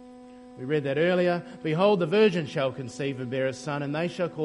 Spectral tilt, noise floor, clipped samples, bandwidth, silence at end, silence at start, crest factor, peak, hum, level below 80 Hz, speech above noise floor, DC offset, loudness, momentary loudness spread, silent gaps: -6.5 dB/octave; -47 dBFS; under 0.1%; 11 kHz; 0 s; 0 s; 18 dB; -8 dBFS; none; -68 dBFS; 21 dB; under 0.1%; -26 LUFS; 10 LU; none